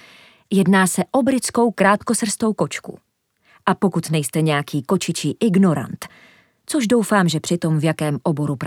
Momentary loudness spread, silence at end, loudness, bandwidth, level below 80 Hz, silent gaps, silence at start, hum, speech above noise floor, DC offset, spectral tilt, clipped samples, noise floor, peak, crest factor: 9 LU; 0 s; -19 LUFS; 17 kHz; -62 dBFS; none; 0.5 s; none; 41 dB; under 0.1%; -5 dB/octave; under 0.1%; -60 dBFS; 0 dBFS; 18 dB